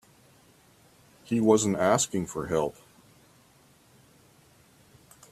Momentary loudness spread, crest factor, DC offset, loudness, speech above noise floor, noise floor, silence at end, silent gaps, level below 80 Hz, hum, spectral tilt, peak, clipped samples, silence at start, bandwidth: 9 LU; 24 dB; under 0.1%; -26 LUFS; 35 dB; -60 dBFS; 2.6 s; none; -62 dBFS; none; -4.5 dB/octave; -6 dBFS; under 0.1%; 1.3 s; 14.5 kHz